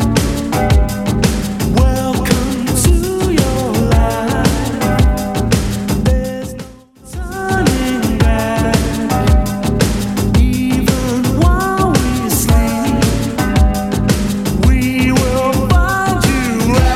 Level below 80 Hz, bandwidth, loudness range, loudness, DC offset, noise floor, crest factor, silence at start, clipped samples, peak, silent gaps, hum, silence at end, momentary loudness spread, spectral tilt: -18 dBFS; 16.5 kHz; 3 LU; -14 LUFS; under 0.1%; -36 dBFS; 14 dB; 0 s; under 0.1%; 0 dBFS; none; none; 0 s; 4 LU; -5.5 dB/octave